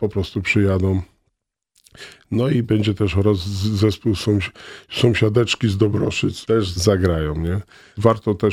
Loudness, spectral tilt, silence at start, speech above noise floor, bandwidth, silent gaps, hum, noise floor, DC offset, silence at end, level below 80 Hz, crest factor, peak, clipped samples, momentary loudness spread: -19 LUFS; -6.5 dB/octave; 0 s; 54 dB; 14.5 kHz; none; none; -73 dBFS; under 0.1%; 0 s; -40 dBFS; 20 dB; 0 dBFS; under 0.1%; 10 LU